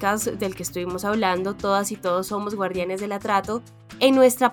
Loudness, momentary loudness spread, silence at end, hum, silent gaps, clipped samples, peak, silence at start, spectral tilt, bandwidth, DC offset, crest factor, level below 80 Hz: -23 LUFS; 11 LU; 0 s; none; none; under 0.1%; -4 dBFS; 0 s; -4 dB/octave; over 20 kHz; under 0.1%; 18 dB; -54 dBFS